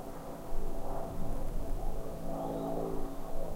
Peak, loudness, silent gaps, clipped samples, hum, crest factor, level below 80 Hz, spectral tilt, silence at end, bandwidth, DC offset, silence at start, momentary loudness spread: -20 dBFS; -40 LUFS; none; under 0.1%; none; 12 dB; -36 dBFS; -7 dB/octave; 0 s; 15.5 kHz; under 0.1%; 0 s; 6 LU